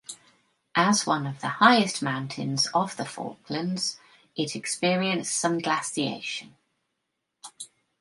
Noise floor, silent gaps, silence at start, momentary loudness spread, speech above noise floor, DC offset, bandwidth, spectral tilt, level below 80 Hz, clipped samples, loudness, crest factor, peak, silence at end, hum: -81 dBFS; none; 0.1 s; 19 LU; 55 dB; under 0.1%; 11.5 kHz; -3.5 dB/octave; -74 dBFS; under 0.1%; -26 LUFS; 24 dB; -4 dBFS; 0.35 s; none